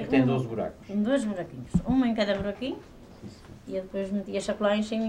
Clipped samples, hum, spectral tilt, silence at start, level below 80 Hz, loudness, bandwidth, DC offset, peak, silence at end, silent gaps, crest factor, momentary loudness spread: under 0.1%; none; -6.5 dB/octave; 0 s; -48 dBFS; -28 LUFS; 10.5 kHz; under 0.1%; -10 dBFS; 0 s; none; 18 dB; 19 LU